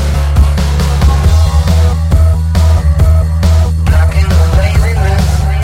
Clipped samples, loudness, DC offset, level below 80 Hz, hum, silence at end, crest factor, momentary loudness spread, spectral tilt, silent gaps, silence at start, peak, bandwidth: 0.2%; -10 LUFS; under 0.1%; -10 dBFS; none; 0 s; 8 dB; 2 LU; -6.5 dB/octave; none; 0 s; 0 dBFS; 14 kHz